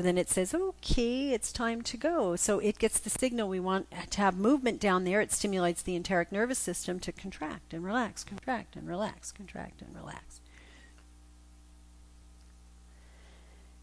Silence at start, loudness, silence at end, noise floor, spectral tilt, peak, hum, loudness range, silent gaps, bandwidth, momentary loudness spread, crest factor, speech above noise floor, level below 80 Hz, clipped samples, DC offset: 0 s; -31 LUFS; 0 s; -56 dBFS; -4 dB/octave; -14 dBFS; 60 Hz at -55 dBFS; 14 LU; none; 11 kHz; 15 LU; 18 dB; 24 dB; -48 dBFS; under 0.1%; under 0.1%